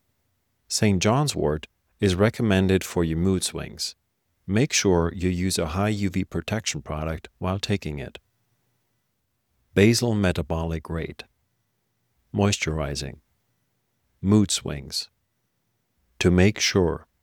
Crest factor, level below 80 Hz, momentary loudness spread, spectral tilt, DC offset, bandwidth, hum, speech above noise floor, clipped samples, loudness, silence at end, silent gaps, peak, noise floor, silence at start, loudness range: 22 dB; -44 dBFS; 13 LU; -5 dB/octave; under 0.1%; 17 kHz; none; 52 dB; under 0.1%; -24 LUFS; 0.2 s; none; -4 dBFS; -75 dBFS; 0.7 s; 6 LU